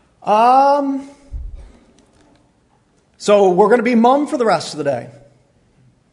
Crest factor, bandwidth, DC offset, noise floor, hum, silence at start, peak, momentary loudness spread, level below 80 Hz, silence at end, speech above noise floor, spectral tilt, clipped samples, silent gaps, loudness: 16 dB; 11 kHz; under 0.1%; -57 dBFS; none; 0.25 s; 0 dBFS; 23 LU; -40 dBFS; 1 s; 44 dB; -5.5 dB/octave; under 0.1%; none; -14 LUFS